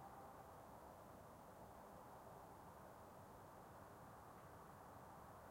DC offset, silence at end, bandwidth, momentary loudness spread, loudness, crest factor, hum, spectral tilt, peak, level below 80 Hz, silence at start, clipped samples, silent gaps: under 0.1%; 0 s; 16.5 kHz; 1 LU; -61 LUFS; 14 dB; none; -5.5 dB/octave; -48 dBFS; -76 dBFS; 0 s; under 0.1%; none